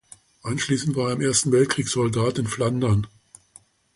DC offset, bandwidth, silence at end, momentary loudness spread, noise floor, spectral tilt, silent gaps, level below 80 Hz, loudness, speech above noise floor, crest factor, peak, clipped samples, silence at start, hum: under 0.1%; 11.5 kHz; 0.9 s; 8 LU; -54 dBFS; -5 dB/octave; none; -50 dBFS; -22 LUFS; 32 dB; 16 dB; -8 dBFS; under 0.1%; 0.45 s; none